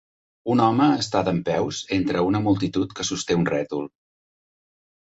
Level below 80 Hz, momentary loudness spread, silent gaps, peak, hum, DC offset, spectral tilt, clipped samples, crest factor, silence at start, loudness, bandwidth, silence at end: -52 dBFS; 8 LU; none; -6 dBFS; none; under 0.1%; -5.5 dB/octave; under 0.1%; 18 dB; 0.45 s; -23 LUFS; 8 kHz; 1.2 s